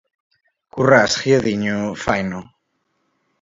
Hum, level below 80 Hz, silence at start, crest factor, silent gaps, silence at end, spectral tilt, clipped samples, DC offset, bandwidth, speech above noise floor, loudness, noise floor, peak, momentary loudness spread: none; -50 dBFS; 0.75 s; 20 dB; none; 1 s; -5 dB/octave; under 0.1%; under 0.1%; 8 kHz; 53 dB; -17 LUFS; -70 dBFS; 0 dBFS; 14 LU